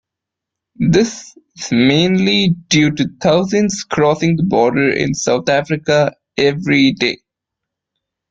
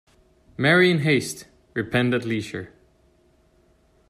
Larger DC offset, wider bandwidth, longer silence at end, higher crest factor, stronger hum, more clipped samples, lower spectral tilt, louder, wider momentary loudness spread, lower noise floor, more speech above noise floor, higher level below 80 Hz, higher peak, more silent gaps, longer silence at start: neither; second, 9.2 kHz vs 13.5 kHz; second, 1.15 s vs 1.45 s; about the same, 14 dB vs 18 dB; neither; neither; about the same, -5 dB/octave vs -5.5 dB/octave; first, -15 LUFS vs -22 LUFS; second, 6 LU vs 20 LU; first, -82 dBFS vs -60 dBFS; first, 68 dB vs 39 dB; first, -50 dBFS vs -58 dBFS; first, -2 dBFS vs -6 dBFS; neither; first, 0.8 s vs 0.6 s